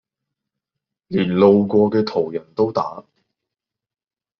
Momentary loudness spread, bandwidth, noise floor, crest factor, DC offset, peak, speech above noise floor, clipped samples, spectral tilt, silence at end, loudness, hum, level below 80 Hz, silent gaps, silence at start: 12 LU; 6.4 kHz; under -90 dBFS; 18 dB; under 0.1%; -2 dBFS; over 73 dB; under 0.1%; -6.5 dB/octave; 1.4 s; -18 LUFS; none; -62 dBFS; none; 1.1 s